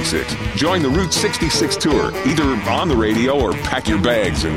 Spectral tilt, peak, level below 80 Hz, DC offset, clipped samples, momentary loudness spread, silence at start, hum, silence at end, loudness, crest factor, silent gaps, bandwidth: -4.5 dB/octave; -4 dBFS; -30 dBFS; 0.4%; under 0.1%; 3 LU; 0 s; none; 0 s; -17 LUFS; 14 dB; none; 16.5 kHz